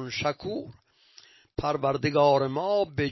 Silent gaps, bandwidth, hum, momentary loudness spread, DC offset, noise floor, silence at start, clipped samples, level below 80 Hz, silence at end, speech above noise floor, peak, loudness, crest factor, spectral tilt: none; 6.2 kHz; none; 15 LU; under 0.1%; -57 dBFS; 0 s; under 0.1%; -54 dBFS; 0 s; 31 dB; -10 dBFS; -26 LUFS; 18 dB; -6 dB/octave